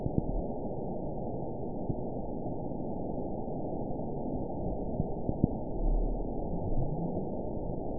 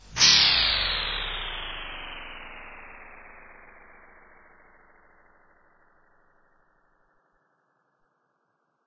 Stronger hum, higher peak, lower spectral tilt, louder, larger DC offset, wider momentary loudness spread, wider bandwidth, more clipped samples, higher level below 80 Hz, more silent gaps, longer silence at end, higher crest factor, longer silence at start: neither; second, -10 dBFS vs -4 dBFS; first, -16.5 dB/octave vs 0.5 dB/octave; second, -36 LUFS vs -21 LUFS; first, 1% vs under 0.1%; second, 4 LU vs 28 LU; second, 1 kHz vs 7.8 kHz; neither; first, -38 dBFS vs -48 dBFS; neither; second, 0 s vs 5.35 s; about the same, 24 dB vs 26 dB; about the same, 0 s vs 0.05 s